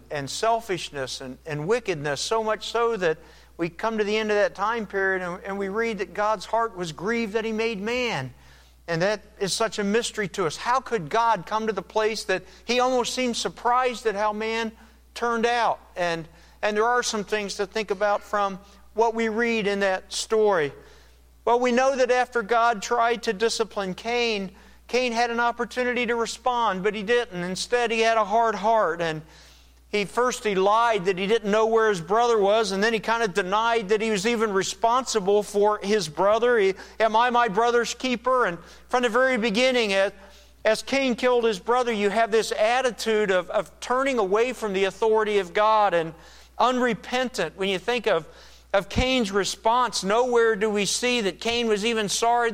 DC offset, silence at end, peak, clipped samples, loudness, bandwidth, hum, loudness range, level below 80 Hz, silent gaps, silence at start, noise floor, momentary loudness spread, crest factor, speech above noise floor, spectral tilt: under 0.1%; 0 s; -8 dBFS; under 0.1%; -24 LUFS; 15.5 kHz; none; 4 LU; -52 dBFS; none; 0.1 s; -53 dBFS; 7 LU; 16 dB; 29 dB; -3.5 dB/octave